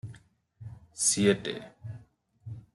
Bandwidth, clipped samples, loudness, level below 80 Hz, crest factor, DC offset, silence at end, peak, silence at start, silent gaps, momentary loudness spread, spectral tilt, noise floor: 12.5 kHz; under 0.1%; -26 LUFS; -64 dBFS; 20 dB; under 0.1%; 0.15 s; -12 dBFS; 0.05 s; none; 25 LU; -3.5 dB/octave; -58 dBFS